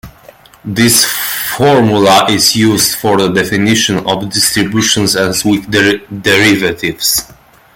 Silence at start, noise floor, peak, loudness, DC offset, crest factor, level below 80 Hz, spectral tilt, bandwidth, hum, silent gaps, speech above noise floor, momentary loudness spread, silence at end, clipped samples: 0.05 s; -39 dBFS; 0 dBFS; -10 LUFS; under 0.1%; 12 dB; -44 dBFS; -3 dB/octave; over 20 kHz; none; none; 29 dB; 7 LU; 0.45 s; under 0.1%